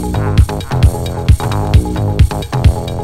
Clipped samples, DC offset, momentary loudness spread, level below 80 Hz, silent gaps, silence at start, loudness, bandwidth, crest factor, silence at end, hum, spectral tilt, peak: 1%; under 0.1%; 2 LU; -16 dBFS; none; 0 s; -14 LUFS; 15 kHz; 12 dB; 0 s; none; -7 dB/octave; 0 dBFS